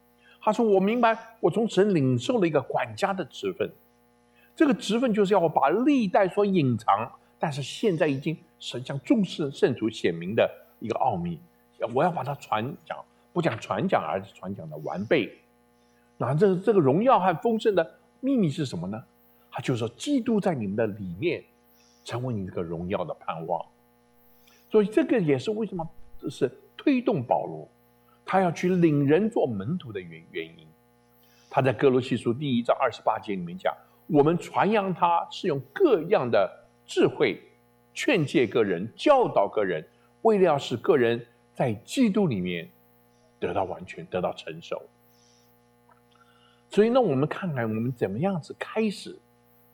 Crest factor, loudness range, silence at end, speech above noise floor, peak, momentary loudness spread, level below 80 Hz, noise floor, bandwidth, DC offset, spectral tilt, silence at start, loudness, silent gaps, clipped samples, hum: 18 dB; 5 LU; 0.55 s; 37 dB; -8 dBFS; 14 LU; -64 dBFS; -62 dBFS; 19 kHz; under 0.1%; -6.5 dB/octave; 0.45 s; -26 LUFS; none; under 0.1%; 60 Hz at -55 dBFS